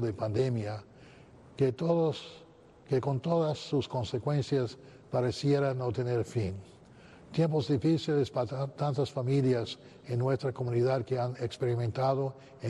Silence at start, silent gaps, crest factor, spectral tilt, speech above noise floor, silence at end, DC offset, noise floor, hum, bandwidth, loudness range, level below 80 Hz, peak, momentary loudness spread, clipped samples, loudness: 0 s; none; 14 dB; -7.5 dB/octave; 24 dB; 0 s; under 0.1%; -54 dBFS; none; 10.5 kHz; 2 LU; -64 dBFS; -16 dBFS; 9 LU; under 0.1%; -31 LUFS